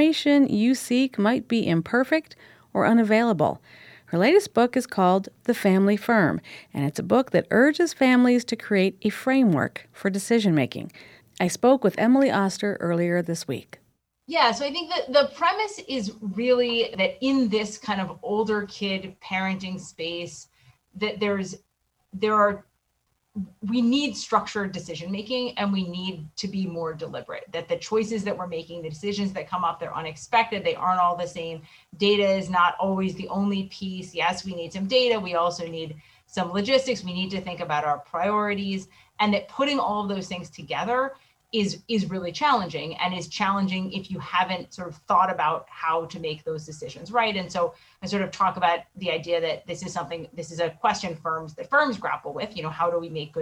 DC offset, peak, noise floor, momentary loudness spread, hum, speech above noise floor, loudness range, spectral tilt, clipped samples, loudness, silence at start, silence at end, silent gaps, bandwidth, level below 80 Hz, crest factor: under 0.1%; -6 dBFS; -73 dBFS; 13 LU; none; 49 dB; 6 LU; -5 dB/octave; under 0.1%; -25 LUFS; 0 s; 0 s; none; 16 kHz; -64 dBFS; 18 dB